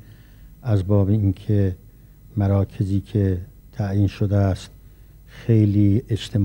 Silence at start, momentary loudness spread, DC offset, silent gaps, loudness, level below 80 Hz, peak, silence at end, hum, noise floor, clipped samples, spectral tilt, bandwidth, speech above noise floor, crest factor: 0.1 s; 13 LU; under 0.1%; none; -21 LUFS; -44 dBFS; -6 dBFS; 0 s; none; -46 dBFS; under 0.1%; -9 dB/octave; 16.5 kHz; 27 dB; 16 dB